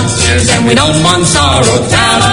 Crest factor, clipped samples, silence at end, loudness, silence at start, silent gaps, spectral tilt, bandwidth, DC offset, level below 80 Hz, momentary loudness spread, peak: 8 dB; 0.6%; 0 s; -8 LUFS; 0 s; none; -3.5 dB/octave; 16.5 kHz; under 0.1%; -28 dBFS; 1 LU; 0 dBFS